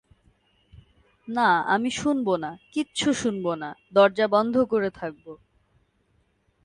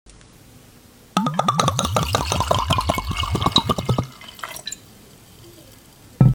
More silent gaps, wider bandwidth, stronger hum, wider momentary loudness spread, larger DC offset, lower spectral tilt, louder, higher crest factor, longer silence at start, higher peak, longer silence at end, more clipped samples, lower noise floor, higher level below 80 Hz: neither; second, 11 kHz vs 18 kHz; neither; second, 12 LU vs 15 LU; neither; about the same, -4.5 dB/octave vs -4.5 dB/octave; second, -24 LUFS vs -21 LUFS; about the same, 20 dB vs 22 dB; first, 1.25 s vs 0.55 s; second, -6 dBFS vs 0 dBFS; first, 1.3 s vs 0 s; neither; first, -67 dBFS vs -48 dBFS; second, -60 dBFS vs -36 dBFS